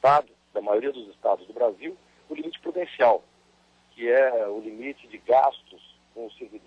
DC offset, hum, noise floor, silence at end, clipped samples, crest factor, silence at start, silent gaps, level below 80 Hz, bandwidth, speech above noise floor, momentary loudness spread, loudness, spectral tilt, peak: under 0.1%; none; -61 dBFS; 0.1 s; under 0.1%; 16 dB; 0 s; none; -68 dBFS; 8.4 kHz; 37 dB; 19 LU; -25 LUFS; -6 dB/octave; -10 dBFS